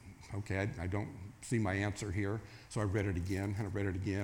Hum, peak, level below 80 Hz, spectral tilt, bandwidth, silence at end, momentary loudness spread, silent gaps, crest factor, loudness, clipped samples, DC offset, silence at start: none; -22 dBFS; -58 dBFS; -6.5 dB/octave; 15.5 kHz; 0 s; 9 LU; none; 16 dB; -38 LUFS; under 0.1%; under 0.1%; 0 s